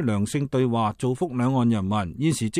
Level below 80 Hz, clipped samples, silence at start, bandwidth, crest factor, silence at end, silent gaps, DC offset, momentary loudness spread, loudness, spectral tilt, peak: -54 dBFS; under 0.1%; 0 s; 14.5 kHz; 14 dB; 0 s; none; under 0.1%; 3 LU; -24 LUFS; -6.5 dB/octave; -10 dBFS